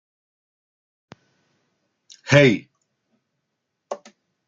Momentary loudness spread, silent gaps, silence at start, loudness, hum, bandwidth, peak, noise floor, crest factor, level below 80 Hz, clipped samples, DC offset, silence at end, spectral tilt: 22 LU; none; 2.25 s; -17 LUFS; none; 7.6 kHz; -2 dBFS; -78 dBFS; 24 dB; -64 dBFS; under 0.1%; under 0.1%; 0.5 s; -5.5 dB/octave